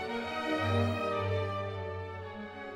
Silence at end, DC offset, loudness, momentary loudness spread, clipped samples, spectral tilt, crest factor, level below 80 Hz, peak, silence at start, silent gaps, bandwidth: 0 s; under 0.1%; -34 LUFS; 12 LU; under 0.1%; -6.5 dB/octave; 16 dB; -64 dBFS; -16 dBFS; 0 s; none; 11.5 kHz